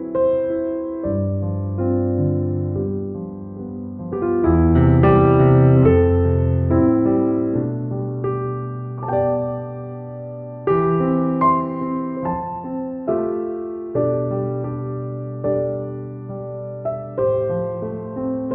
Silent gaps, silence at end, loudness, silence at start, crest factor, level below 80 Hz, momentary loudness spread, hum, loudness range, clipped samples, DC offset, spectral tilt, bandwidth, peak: none; 0 s; -20 LUFS; 0 s; 16 dB; -36 dBFS; 16 LU; none; 9 LU; under 0.1%; under 0.1%; -10.5 dB/octave; 3.3 kHz; -4 dBFS